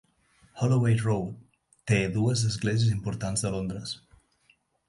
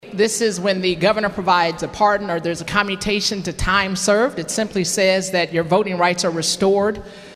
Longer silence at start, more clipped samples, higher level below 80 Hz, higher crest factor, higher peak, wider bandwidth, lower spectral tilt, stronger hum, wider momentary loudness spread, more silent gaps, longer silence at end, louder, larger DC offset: first, 0.55 s vs 0.05 s; neither; second, -52 dBFS vs -40 dBFS; about the same, 18 dB vs 18 dB; second, -10 dBFS vs 0 dBFS; second, 11.5 kHz vs 14 kHz; first, -5.5 dB/octave vs -3.5 dB/octave; neither; first, 14 LU vs 5 LU; neither; first, 0.9 s vs 0 s; second, -27 LUFS vs -18 LUFS; neither